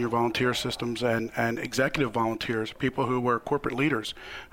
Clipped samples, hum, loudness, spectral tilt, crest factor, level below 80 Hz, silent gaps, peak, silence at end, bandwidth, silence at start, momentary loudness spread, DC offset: under 0.1%; none; -28 LUFS; -5 dB/octave; 16 dB; -54 dBFS; none; -10 dBFS; 0.05 s; 16 kHz; 0 s; 5 LU; under 0.1%